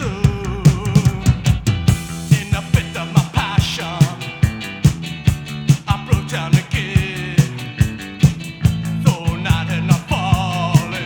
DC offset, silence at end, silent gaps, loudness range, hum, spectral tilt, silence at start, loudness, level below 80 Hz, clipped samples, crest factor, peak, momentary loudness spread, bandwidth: under 0.1%; 0 s; none; 1 LU; none; -6 dB/octave; 0 s; -18 LUFS; -30 dBFS; under 0.1%; 16 dB; 0 dBFS; 4 LU; 20 kHz